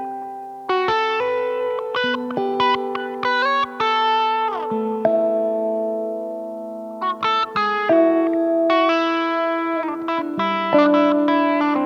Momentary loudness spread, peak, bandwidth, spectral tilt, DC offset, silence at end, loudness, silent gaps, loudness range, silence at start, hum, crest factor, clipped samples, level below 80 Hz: 10 LU; -4 dBFS; 7.4 kHz; -5.5 dB/octave; under 0.1%; 0 s; -20 LUFS; none; 3 LU; 0 s; none; 16 dB; under 0.1%; -66 dBFS